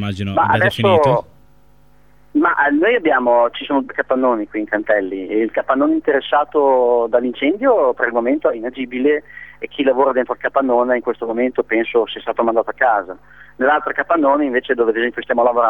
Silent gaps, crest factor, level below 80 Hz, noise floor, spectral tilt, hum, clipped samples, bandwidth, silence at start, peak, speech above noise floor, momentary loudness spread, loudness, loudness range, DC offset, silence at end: none; 16 dB; -54 dBFS; -52 dBFS; -7 dB/octave; none; under 0.1%; 10.5 kHz; 0 s; 0 dBFS; 36 dB; 7 LU; -17 LUFS; 2 LU; 0.4%; 0 s